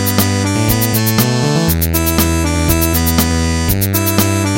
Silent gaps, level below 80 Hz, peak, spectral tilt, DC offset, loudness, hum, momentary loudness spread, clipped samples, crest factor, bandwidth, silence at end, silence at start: none; -24 dBFS; 0 dBFS; -4.5 dB/octave; under 0.1%; -13 LUFS; none; 2 LU; under 0.1%; 14 dB; 17 kHz; 0 s; 0 s